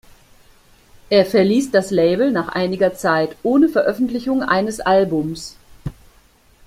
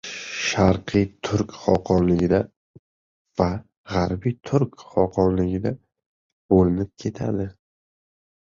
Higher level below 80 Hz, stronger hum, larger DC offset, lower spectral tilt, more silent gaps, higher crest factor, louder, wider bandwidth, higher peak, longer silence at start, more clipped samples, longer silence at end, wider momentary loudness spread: second, -48 dBFS vs -42 dBFS; neither; neither; about the same, -5.5 dB/octave vs -6.5 dB/octave; second, none vs 2.56-3.25 s, 3.77-3.84 s, 6.06-6.49 s; about the same, 16 dB vs 20 dB; first, -17 LUFS vs -23 LUFS; first, 15.5 kHz vs 7.6 kHz; about the same, -2 dBFS vs -2 dBFS; first, 1.1 s vs 0.05 s; neither; second, 0.75 s vs 1.05 s; first, 16 LU vs 10 LU